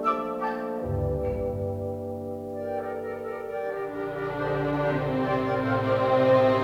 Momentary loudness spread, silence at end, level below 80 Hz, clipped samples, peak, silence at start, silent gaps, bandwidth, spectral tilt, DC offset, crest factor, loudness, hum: 11 LU; 0 s; -46 dBFS; under 0.1%; -10 dBFS; 0 s; none; 15.5 kHz; -8 dB/octave; under 0.1%; 16 dB; -28 LUFS; none